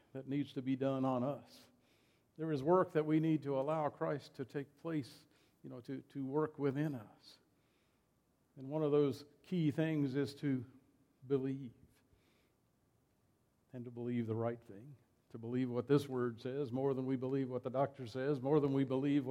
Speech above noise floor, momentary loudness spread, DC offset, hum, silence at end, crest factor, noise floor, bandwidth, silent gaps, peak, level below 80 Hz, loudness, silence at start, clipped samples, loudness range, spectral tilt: 39 dB; 16 LU; under 0.1%; none; 0 s; 20 dB; -77 dBFS; 13 kHz; none; -18 dBFS; -80 dBFS; -38 LUFS; 0.15 s; under 0.1%; 9 LU; -8.5 dB/octave